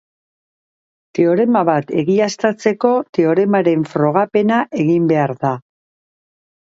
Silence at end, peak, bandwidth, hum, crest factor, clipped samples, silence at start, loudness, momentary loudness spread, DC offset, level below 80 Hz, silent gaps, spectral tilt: 1.05 s; 0 dBFS; 7.8 kHz; none; 16 dB; under 0.1%; 1.15 s; -16 LUFS; 4 LU; under 0.1%; -64 dBFS; 3.09-3.13 s; -7 dB/octave